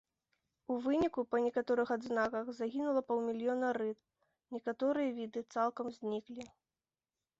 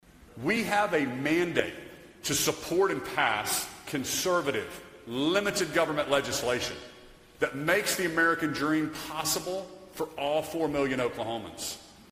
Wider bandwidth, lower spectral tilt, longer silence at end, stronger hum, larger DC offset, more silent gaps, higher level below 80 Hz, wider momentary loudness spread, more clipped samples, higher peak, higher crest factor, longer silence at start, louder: second, 7.8 kHz vs 16 kHz; about the same, -4 dB/octave vs -3 dB/octave; first, 0.95 s vs 0 s; neither; neither; neither; second, -74 dBFS vs -60 dBFS; about the same, 10 LU vs 11 LU; neither; second, -20 dBFS vs -8 dBFS; second, 16 dB vs 22 dB; first, 0.7 s vs 0.15 s; second, -36 LUFS vs -29 LUFS